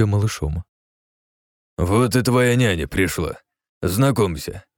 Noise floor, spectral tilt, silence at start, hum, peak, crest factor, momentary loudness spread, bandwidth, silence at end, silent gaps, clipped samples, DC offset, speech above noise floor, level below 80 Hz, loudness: under -90 dBFS; -6 dB/octave; 0 s; none; -4 dBFS; 16 dB; 13 LU; 19 kHz; 0.15 s; 0.69-1.77 s, 3.69-3.81 s; under 0.1%; under 0.1%; over 71 dB; -38 dBFS; -20 LUFS